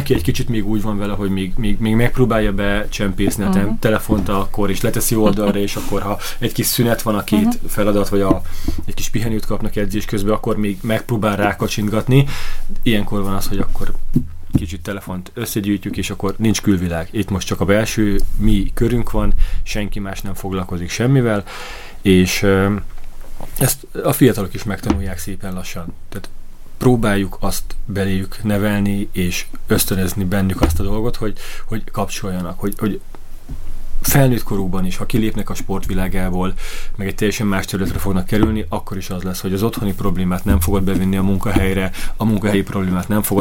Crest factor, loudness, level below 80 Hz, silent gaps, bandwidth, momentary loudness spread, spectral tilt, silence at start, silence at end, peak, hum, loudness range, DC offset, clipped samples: 16 dB; -19 LUFS; -24 dBFS; none; 17 kHz; 11 LU; -5.5 dB/octave; 0 s; 0 s; 0 dBFS; none; 4 LU; under 0.1%; under 0.1%